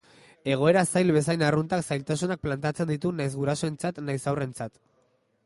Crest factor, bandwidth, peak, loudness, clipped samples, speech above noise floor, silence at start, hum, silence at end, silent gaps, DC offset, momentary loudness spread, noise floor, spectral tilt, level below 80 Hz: 18 dB; 11.5 kHz; -8 dBFS; -26 LUFS; under 0.1%; 42 dB; 0.45 s; none; 0.75 s; none; under 0.1%; 9 LU; -68 dBFS; -6 dB/octave; -58 dBFS